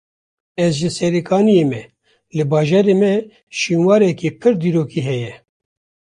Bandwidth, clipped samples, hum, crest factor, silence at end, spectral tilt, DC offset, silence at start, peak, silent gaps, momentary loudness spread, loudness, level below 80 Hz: 11 kHz; under 0.1%; none; 14 dB; 0.65 s; -6.5 dB/octave; under 0.1%; 0.6 s; -2 dBFS; 3.43-3.47 s; 12 LU; -16 LUFS; -56 dBFS